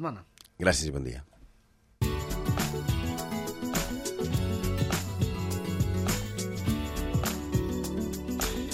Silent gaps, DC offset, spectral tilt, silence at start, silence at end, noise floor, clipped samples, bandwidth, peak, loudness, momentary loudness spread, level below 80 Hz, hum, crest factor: none; under 0.1%; -5 dB/octave; 0 s; 0 s; -63 dBFS; under 0.1%; 16 kHz; -10 dBFS; -31 LUFS; 5 LU; -40 dBFS; none; 22 dB